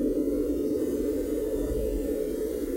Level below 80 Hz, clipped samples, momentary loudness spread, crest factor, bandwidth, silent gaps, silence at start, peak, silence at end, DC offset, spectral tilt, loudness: -40 dBFS; under 0.1%; 2 LU; 12 dB; 16 kHz; none; 0 s; -16 dBFS; 0 s; under 0.1%; -7 dB/octave; -29 LUFS